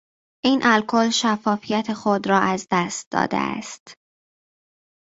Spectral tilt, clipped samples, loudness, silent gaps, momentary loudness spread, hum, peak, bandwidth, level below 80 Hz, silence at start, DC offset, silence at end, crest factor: -4 dB/octave; under 0.1%; -21 LUFS; 3.06-3.11 s, 3.80-3.86 s; 8 LU; none; -2 dBFS; 8 kHz; -62 dBFS; 0.45 s; under 0.1%; 1.1 s; 20 dB